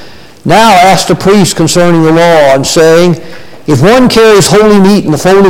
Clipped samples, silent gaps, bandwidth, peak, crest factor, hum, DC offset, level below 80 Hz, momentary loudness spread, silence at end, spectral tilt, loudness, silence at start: 0.4%; none; 17.5 kHz; 0 dBFS; 4 dB; none; under 0.1%; -32 dBFS; 6 LU; 0 s; -5 dB/octave; -5 LUFS; 0 s